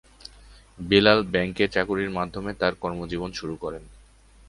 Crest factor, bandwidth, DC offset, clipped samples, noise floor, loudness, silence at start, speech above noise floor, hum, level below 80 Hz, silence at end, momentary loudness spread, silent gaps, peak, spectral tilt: 24 dB; 11.5 kHz; under 0.1%; under 0.1%; -53 dBFS; -24 LUFS; 0.45 s; 28 dB; none; -48 dBFS; 0.5 s; 19 LU; none; -2 dBFS; -5.5 dB/octave